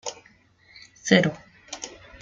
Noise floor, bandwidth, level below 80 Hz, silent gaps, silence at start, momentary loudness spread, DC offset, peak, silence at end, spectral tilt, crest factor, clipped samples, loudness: -58 dBFS; 7.8 kHz; -62 dBFS; none; 0.05 s; 20 LU; under 0.1%; -2 dBFS; 0.3 s; -4.5 dB/octave; 26 dB; under 0.1%; -22 LUFS